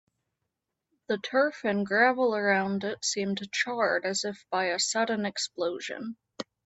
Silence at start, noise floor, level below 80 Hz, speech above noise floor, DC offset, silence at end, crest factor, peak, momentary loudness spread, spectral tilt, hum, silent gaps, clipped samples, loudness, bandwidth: 1.1 s; -84 dBFS; -74 dBFS; 56 dB; under 0.1%; 0.25 s; 20 dB; -10 dBFS; 11 LU; -3 dB/octave; none; none; under 0.1%; -28 LUFS; 8.4 kHz